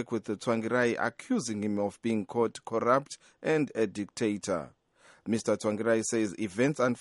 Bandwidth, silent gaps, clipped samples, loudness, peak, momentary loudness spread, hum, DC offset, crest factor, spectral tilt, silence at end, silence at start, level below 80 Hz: 11.5 kHz; none; under 0.1%; -30 LUFS; -10 dBFS; 7 LU; none; under 0.1%; 20 dB; -5 dB/octave; 0 s; 0 s; -72 dBFS